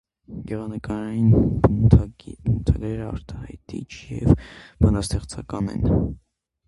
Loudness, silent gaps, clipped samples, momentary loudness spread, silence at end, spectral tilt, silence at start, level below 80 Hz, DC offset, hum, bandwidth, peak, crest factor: -22 LUFS; none; under 0.1%; 18 LU; 0.5 s; -8 dB/octave; 0.3 s; -30 dBFS; under 0.1%; none; 11.5 kHz; 0 dBFS; 22 dB